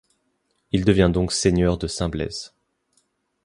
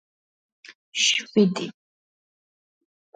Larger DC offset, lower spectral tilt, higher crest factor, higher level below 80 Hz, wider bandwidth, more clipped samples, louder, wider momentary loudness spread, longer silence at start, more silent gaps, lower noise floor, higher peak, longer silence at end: neither; first, -5.5 dB/octave vs -3 dB/octave; about the same, 20 dB vs 20 dB; first, -36 dBFS vs -74 dBFS; first, 11.5 kHz vs 9.4 kHz; neither; about the same, -21 LUFS vs -22 LUFS; about the same, 12 LU vs 13 LU; about the same, 0.75 s vs 0.7 s; second, none vs 0.75-0.92 s; second, -71 dBFS vs under -90 dBFS; first, -2 dBFS vs -8 dBFS; second, 0.95 s vs 1.45 s